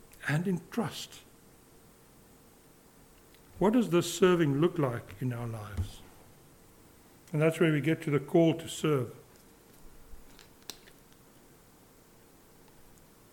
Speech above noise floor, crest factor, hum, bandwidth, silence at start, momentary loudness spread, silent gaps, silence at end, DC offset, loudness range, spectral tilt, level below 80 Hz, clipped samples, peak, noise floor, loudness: 30 dB; 22 dB; none; 18 kHz; 0.2 s; 18 LU; none; 2.6 s; under 0.1%; 8 LU; -6 dB/octave; -58 dBFS; under 0.1%; -12 dBFS; -59 dBFS; -30 LUFS